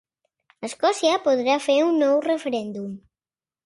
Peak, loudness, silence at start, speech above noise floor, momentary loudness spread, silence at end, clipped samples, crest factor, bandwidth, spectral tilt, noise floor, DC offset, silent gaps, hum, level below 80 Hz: -6 dBFS; -21 LUFS; 0.6 s; over 69 dB; 16 LU; 0.65 s; under 0.1%; 16 dB; 11.5 kHz; -4 dB/octave; under -90 dBFS; under 0.1%; none; none; -72 dBFS